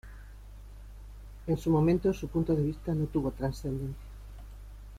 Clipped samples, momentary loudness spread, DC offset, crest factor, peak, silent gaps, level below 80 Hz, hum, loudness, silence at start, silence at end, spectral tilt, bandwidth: under 0.1%; 24 LU; under 0.1%; 16 dB; -16 dBFS; none; -44 dBFS; none; -30 LUFS; 0.05 s; 0 s; -8.5 dB/octave; 15 kHz